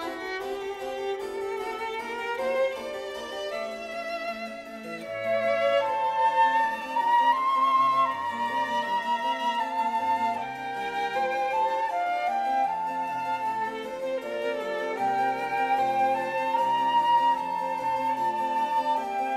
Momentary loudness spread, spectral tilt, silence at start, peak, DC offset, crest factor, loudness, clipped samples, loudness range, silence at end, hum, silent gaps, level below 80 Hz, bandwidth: 11 LU; -3.5 dB/octave; 0 s; -12 dBFS; under 0.1%; 16 dB; -27 LUFS; under 0.1%; 7 LU; 0 s; none; none; -68 dBFS; 15.5 kHz